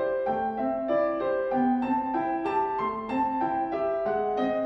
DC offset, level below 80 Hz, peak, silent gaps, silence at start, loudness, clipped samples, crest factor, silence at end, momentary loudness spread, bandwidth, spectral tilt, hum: under 0.1%; -58 dBFS; -16 dBFS; none; 0 s; -27 LUFS; under 0.1%; 12 dB; 0 s; 3 LU; 5.8 kHz; -8 dB/octave; none